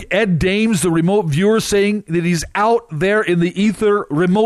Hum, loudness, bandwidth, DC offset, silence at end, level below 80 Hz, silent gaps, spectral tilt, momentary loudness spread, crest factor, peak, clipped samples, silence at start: none; -16 LUFS; 14 kHz; under 0.1%; 0 s; -40 dBFS; none; -5.5 dB/octave; 3 LU; 10 dB; -6 dBFS; under 0.1%; 0 s